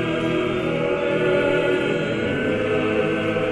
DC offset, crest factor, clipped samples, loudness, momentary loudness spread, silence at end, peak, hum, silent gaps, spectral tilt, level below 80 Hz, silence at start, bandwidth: under 0.1%; 14 dB; under 0.1%; -21 LUFS; 3 LU; 0 s; -8 dBFS; none; none; -6.5 dB/octave; -48 dBFS; 0 s; 11 kHz